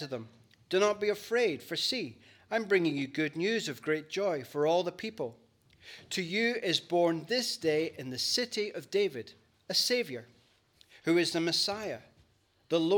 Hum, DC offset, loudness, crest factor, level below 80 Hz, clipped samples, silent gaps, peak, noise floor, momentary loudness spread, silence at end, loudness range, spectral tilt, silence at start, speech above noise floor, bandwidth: none; under 0.1%; -31 LUFS; 20 dB; -78 dBFS; under 0.1%; none; -12 dBFS; -68 dBFS; 13 LU; 0 s; 2 LU; -3.5 dB/octave; 0 s; 37 dB; 19 kHz